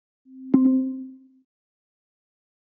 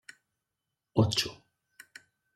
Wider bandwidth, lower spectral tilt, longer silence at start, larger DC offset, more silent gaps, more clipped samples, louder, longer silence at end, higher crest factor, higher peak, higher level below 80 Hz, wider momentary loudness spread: second, 2.2 kHz vs 14 kHz; first, -11.5 dB/octave vs -5 dB/octave; second, 0.35 s vs 0.95 s; neither; neither; neither; first, -22 LUFS vs -29 LUFS; first, 1.55 s vs 1 s; about the same, 22 dB vs 24 dB; first, -4 dBFS vs -12 dBFS; second, -72 dBFS vs -66 dBFS; about the same, 23 LU vs 25 LU